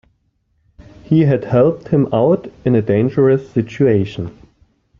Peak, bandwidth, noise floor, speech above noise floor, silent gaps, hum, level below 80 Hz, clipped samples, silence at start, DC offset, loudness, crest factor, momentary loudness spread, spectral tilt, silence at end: -2 dBFS; 7 kHz; -63 dBFS; 49 dB; none; none; -50 dBFS; under 0.1%; 1.1 s; under 0.1%; -15 LUFS; 14 dB; 7 LU; -10 dB/octave; 0.7 s